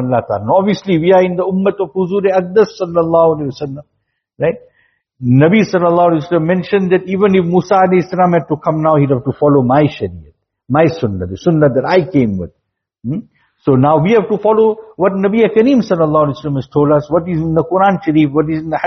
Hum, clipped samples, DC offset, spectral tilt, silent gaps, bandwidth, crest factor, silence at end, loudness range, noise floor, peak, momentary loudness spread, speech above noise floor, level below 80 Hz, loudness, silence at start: none; under 0.1%; under 0.1%; -7 dB/octave; none; 6.4 kHz; 12 dB; 0 s; 3 LU; -54 dBFS; 0 dBFS; 9 LU; 41 dB; -48 dBFS; -13 LUFS; 0 s